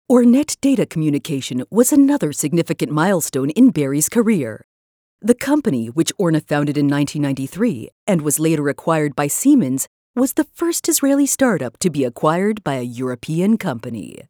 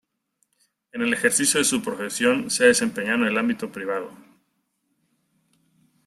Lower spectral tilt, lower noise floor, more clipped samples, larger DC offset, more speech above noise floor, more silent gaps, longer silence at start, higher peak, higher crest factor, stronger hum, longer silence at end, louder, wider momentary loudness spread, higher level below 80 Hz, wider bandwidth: first, -5 dB/octave vs -2.5 dB/octave; first, under -90 dBFS vs -73 dBFS; neither; neither; first, over 73 dB vs 50 dB; first, 4.64-5.19 s, 7.92-8.07 s, 9.87-10.14 s vs none; second, 0.1 s vs 0.95 s; about the same, 0 dBFS vs -2 dBFS; about the same, 18 dB vs 22 dB; neither; second, 0.2 s vs 1.9 s; first, -18 LUFS vs -22 LUFS; about the same, 9 LU vs 11 LU; first, -58 dBFS vs -66 dBFS; first, over 20 kHz vs 15.5 kHz